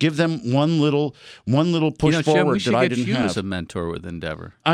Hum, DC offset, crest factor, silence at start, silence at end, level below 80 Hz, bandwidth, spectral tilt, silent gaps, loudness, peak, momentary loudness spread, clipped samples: none; under 0.1%; 16 dB; 0 s; 0 s; -50 dBFS; 11.5 kHz; -6.5 dB/octave; none; -21 LUFS; -4 dBFS; 11 LU; under 0.1%